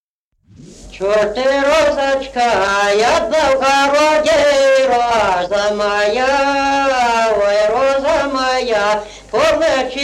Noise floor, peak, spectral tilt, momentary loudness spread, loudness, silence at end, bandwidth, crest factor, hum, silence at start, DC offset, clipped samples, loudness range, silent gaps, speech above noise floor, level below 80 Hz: -60 dBFS; -4 dBFS; -2.5 dB/octave; 4 LU; -14 LUFS; 0 s; 13.5 kHz; 12 dB; none; 0.6 s; under 0.1%; under 0.1%; 2 LU; none; 47 dB; -42 dBFS